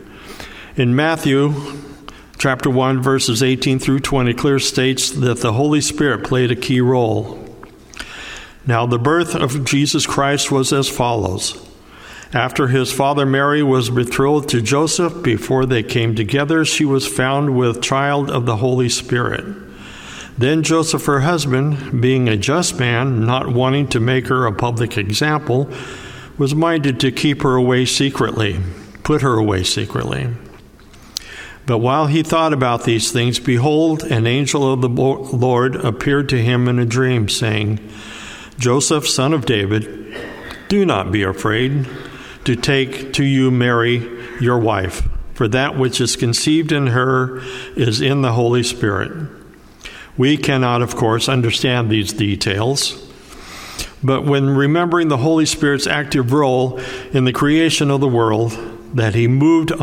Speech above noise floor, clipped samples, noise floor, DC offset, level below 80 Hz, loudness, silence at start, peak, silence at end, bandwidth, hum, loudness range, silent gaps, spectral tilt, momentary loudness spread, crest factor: 26 dB; under 0.1%; -41 dBFS; under 0.1%; -40 dBFS; -16 LUFS; 0 s; 0 dBFS; 0 s; 16 kHz; none; 3 LU; none; -5 dB/octave; 14 LU; 16 dB